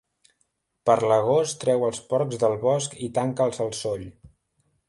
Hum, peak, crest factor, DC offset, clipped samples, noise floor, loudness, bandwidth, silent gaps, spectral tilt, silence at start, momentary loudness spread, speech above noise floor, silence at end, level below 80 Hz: none; -6 dBFS; 20 dB; under 0.1%; under 0.1%; -73 dBFS; -24 LUFS; 11.5 kHz; none; -5 dB/octave; 0.85 s; 9 LU; 50 dB; 0.6 s; -60 dBFS